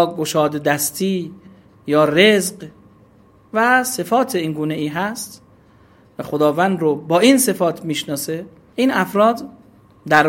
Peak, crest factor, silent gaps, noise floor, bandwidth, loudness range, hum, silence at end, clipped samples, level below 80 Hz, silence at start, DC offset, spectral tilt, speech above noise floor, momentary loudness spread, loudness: 0 dBFS; 18 dB; none; -50 dBFS; 16.5 kHz; 3 LU; none; 0 s; under 0.1%; -60 dBFS; 0 s; under 0.1%; -4 dB/octave; 33 dB; 18 LU; -17 LUFS